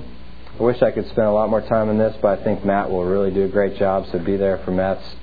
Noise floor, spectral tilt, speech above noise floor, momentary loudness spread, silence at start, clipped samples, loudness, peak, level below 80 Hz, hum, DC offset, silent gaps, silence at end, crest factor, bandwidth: -39 dBFS; -10 dB/octave; 20 dB; 4 LU; 0 s; under 0.1%; -20 LUFS; -2 dBFS; -42 dBFS; none; 3%; none; 0 s; 18 dB; 5 kHz